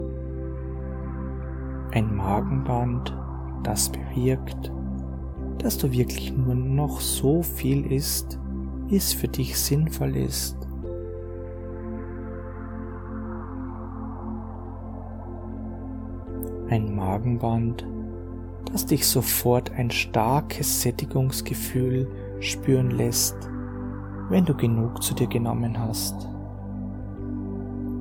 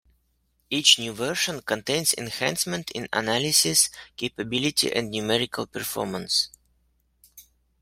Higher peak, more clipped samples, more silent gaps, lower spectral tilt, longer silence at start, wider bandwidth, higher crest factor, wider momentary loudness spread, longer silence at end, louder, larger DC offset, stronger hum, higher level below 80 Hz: second, -6 dBFS vs -2 dBFS; neither; neither; first, -5 dB/octave vs -2 dB/octave; second, 0 s vs 0.7 s; first, 19 kHz vs 16 kHz; about the same, 20 dB vs 24 dB; about the same, 13 LU vs 12 LU; second, 0 s vs 0.4 s; second, -27 LUFS vs -23 LUFS; neither; neither; first, -36 dBFS vs -60 dBFS